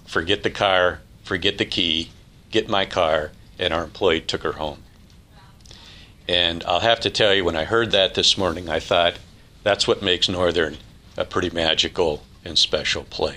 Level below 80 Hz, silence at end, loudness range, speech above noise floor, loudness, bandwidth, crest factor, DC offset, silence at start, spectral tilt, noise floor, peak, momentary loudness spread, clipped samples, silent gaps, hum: -46 dBFS; 0 s; 5 LU; 27 dB; -20 LUFS; 13 kHz; 20 dB; under 0.1%; 0.05 s; -3.5 dB/octave; -48 dBFS; -2 dBFS; 10 LU; under 0.1%; none; none